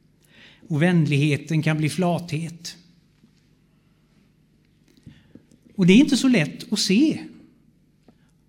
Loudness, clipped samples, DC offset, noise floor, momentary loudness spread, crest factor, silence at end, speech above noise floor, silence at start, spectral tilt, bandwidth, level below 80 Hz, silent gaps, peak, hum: -21 LUFS; under 0.1%; under 0.1%; -60 dBFS; 18 LU; 20 dB; 1.2 s; 40 dB; 0.7 s; -5.5 dB/octave; 16 kHz; -60 dBFS; none; -4 dBFS; none